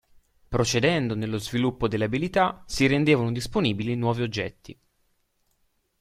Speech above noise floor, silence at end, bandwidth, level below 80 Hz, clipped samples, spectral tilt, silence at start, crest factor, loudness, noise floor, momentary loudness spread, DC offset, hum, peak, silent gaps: 46 dB; 1.3 s; 15 kHz; -48 dBFS; under 0.1%; -5.5 dB/octave; 0.5 s; 18 dB; -25 LUFS; -70 dBFS; 7 LU; under 0.1%; none; -6 dBFS; none